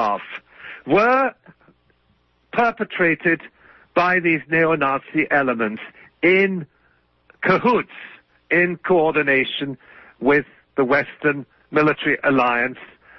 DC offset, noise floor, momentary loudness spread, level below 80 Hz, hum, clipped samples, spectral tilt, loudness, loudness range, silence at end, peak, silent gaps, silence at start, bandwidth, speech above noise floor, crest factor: under 0.1%; -62 dBFS; 14 LU; -60 dBFS; none; under 0.1%; -7.5 dB/octave; -19 LUFS; 2 LU; 0.35 s; -4 dBFS; none; 0 s; 6.2 kHz; 44 dB; 18 dB